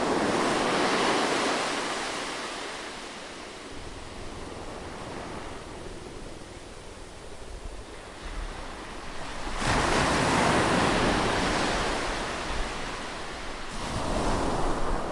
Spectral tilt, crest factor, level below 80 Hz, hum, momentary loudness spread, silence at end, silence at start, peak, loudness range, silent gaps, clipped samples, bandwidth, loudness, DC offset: -4 dB/octave; 18 dB; -40 dBFS; none; 18 LU; 0 s; 0 s; -12 dBFS; 16 LU; none; under 0.1%; 11.5 kHz; -28 LUFS; under 0.1%